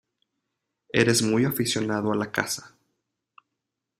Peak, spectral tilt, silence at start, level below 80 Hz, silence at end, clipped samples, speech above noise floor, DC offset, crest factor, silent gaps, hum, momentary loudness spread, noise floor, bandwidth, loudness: -4 dBFS; -4 dB/octave; 0.95 s; -60 dBFS; 1.3 s; under 0.1%; 60 dB; under 0.1%; 24 dB; none; none; 8 LU; -84 dBFS; 15.5 kHz; -24 LUFS